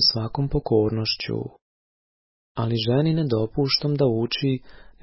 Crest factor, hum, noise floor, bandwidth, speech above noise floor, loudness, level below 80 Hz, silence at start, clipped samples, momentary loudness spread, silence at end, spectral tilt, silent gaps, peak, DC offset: 18 dB; none; under -90 dBFS; 5.8 kHz; over 67 dB; -23 LUFS; -44 dBFS; 0 s; under 0.1%; 9 LU; 0.3 s; -9 dB/octave; 1.62-2.55 s; -6 dBFS; under 0.1%